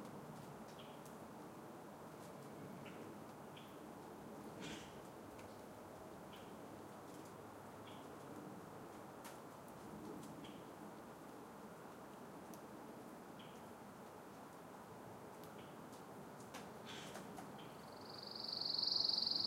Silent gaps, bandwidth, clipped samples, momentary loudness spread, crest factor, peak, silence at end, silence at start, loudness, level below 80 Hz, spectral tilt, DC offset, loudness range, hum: none; 16 kHz; under 0.1%; 7 LU; 24 dB; -26 dBFS; 0 s; 0 s; -49 LUFS; -80 dBFS; -3.5 dB/octave; under 0.1%; 4 LU; none